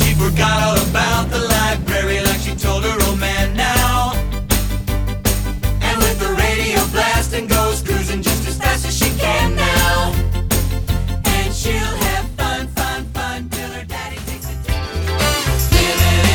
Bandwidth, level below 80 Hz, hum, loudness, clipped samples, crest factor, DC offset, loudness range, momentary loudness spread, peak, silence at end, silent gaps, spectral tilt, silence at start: over 20 kHz; -22 dBFS; none; -17 LUFS; under 0.1%; 16 dB; under 0.1%; 4 LU; 8 LU; 0 dBFS; 0 s; none; -4 dB/octave; 0 s